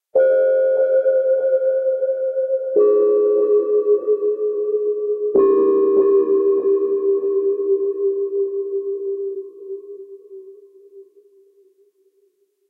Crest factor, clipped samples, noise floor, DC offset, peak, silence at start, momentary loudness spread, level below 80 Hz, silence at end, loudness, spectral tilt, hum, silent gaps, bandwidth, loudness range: 12 dB; under 0.1%; -63 dBFS; under 0.1%; -6 dBFS; 0.15 s; 11 LU; -74 dBFS; 1.7 s; -18 LUFS; -9.5 dB/octave; none; none; 2.6 kHz; 11 LU